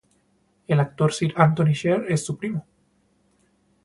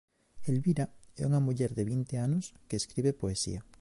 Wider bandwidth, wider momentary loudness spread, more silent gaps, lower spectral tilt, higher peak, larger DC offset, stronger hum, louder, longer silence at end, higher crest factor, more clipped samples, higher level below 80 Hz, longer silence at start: about the same, 11.5 kHz vs 11.5 kHz; first, 10 LU vs 7 LU; neither; about the same, -6.5 dB/octave vs -6.5 dB/octave; first, -2 dBFS vs -18 dBFS; neither; neither; first, -22 LUFS vs -32 LUFS; first, 1.25 s vs 0.05 s; first, 22 dB vs 14 dB; neither; second, -60 dBFS vs -54 dBFS; first, 0.7 s vs 0.35 s